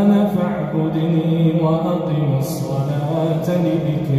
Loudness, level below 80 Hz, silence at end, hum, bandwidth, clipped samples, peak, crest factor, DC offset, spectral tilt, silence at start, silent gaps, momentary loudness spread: -19 LUFS; -48 dBFS; 0 s; none; 14.5 kHz; under 0.1%; -6 dBFS; 12 dB; under 0.1%; -8.5 dB/octave; 0 s; none; 4 LU